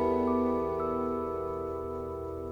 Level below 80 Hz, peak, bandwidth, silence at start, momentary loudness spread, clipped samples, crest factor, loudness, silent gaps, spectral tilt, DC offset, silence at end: -54 dBFS; -16 dBFS; 20 kHz; 0 s; 9 LU; under 0.1%; 14 dB; -32 LUFS; none; -9 dB/octave; under 0.1%; 0 s